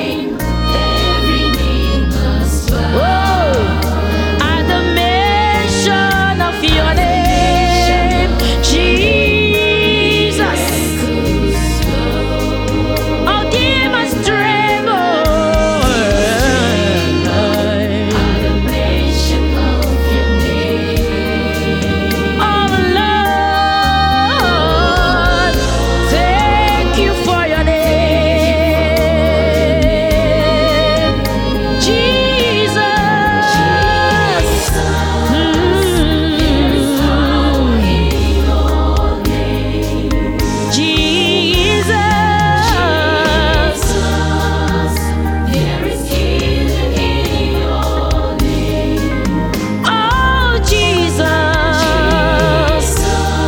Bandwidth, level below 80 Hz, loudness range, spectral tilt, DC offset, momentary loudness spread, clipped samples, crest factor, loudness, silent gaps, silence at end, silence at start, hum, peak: 18.5 kHz; -18 dBFS; 3 LU; -5 dB/octave; under 0.1%; 4 LU; under 0.1%; 12 dB; -13 LUFS; none; 0 s; 0 s; none; 0 dBFS